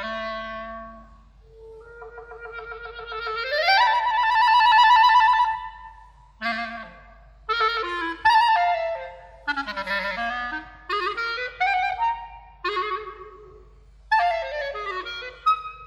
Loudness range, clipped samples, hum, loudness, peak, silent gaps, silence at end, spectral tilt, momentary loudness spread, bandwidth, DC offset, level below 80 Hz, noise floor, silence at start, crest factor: 9 LU; under 0.1%; none; -22 LUFS; -6 dBFS; none; 0 s; -2.5 dB/octave; 22 LU; 14.5 kHz; under 0.1%; -52 dBFS; -50 dBFS; 0 s; 18 dB